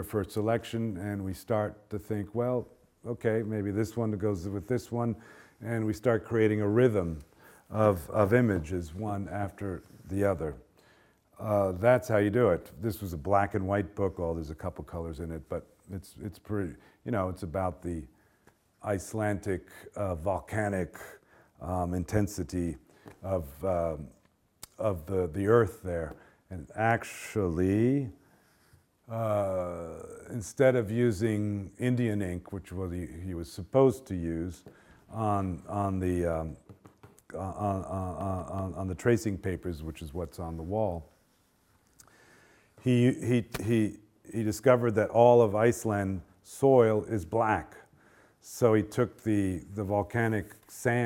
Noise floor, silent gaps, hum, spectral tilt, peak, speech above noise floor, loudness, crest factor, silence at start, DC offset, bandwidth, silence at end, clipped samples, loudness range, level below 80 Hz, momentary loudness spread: -68 dBFS; none; none; -7.5 dB/octave; -8 dBFS; 39 dB; -30 LUFS; 22 dB; 0 s; under 0.1%; 17 kHz; 0 s; under 0.1%; 9 LU; -56 dBFS; 15 LU